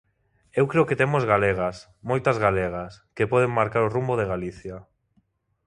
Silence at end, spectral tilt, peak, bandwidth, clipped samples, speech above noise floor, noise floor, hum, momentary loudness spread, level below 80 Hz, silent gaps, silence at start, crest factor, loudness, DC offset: 0.85 s; -7.5 dB/octave; -4 dBFS; 11 kHz; under 0.1%; 44 dB; -68 dBFS; none; 15 LU; -50 dBFS; none; 0.55 s; 20 dB; -23 LUFS; under 0.1%